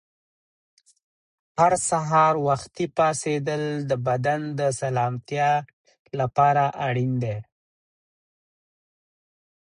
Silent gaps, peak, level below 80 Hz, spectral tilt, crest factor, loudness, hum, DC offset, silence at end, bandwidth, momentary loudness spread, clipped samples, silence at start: 5.73-5.85 s, 5.99-6.05 s; -6 dBFS; -60 dBFS; -5.5 dB/octave; 18 dB; -23 LUFS; none; under 0.1%; 2.25 s; 11 kHz; 8 LU; under 0.1%; 1.55 s